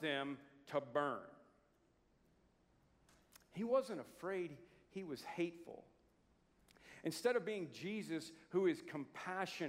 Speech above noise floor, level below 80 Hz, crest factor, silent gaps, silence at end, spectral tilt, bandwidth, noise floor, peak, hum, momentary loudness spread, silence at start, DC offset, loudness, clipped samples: 33 dB; -82 dBFS; 22 dB; none; 0 s; -5 dB/octave; 16 kHz; -76 dBFS; -24 dBFS; none; 16 LU; 0 s; under 0.1%; -43 LUFS; under 0.1%